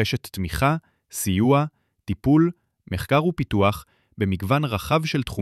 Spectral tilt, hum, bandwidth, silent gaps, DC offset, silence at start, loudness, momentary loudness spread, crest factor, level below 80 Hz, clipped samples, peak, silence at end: -6 dB/octave; none; 15.5 kHz; none; under 0.1%; 0 s; -23 LUFS; 12 LU; 16 dB; -44 dBFS; under 0.1%; -8 dBFS; 0 s